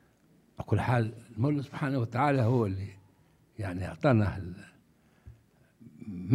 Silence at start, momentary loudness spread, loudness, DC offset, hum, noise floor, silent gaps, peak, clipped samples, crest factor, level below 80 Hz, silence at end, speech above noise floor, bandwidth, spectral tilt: 0.6 s; 18 LU; -30 LUFS; under 0.1%; none; -64 dBFS; none; -10 dBFS; under 0.1%; 20 dB; -60 dBFS; 0 s; 35 dB; 11 kHz; -8.5 dB/octave